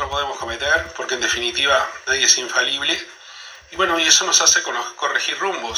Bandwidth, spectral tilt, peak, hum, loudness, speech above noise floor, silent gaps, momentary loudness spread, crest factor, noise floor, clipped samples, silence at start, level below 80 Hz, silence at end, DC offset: over 20 kHz; 0.5 dB/octave; 0 dBFS; none; -17 LUFS; 20 dB; none; 12 LU; 20 dB; -40 dBFS; under 0.1%; 0 s; -48 dBFS; 0 s; under 0.1%